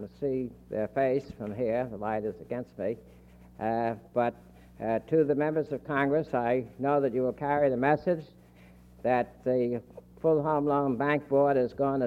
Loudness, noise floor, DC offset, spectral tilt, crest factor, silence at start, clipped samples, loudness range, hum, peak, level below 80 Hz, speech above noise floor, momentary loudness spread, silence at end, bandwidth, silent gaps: -29 LUFS; -54 dBFS; under 0.1%; -9 dB/octave; 18 dB; 0 s; under 0.1%; 5 LU; 60 Hz at -60 dBFS; -10 dBFS; -60 dBFS; 26 dB; 10 LU; 0 s; 7.4 kHz; none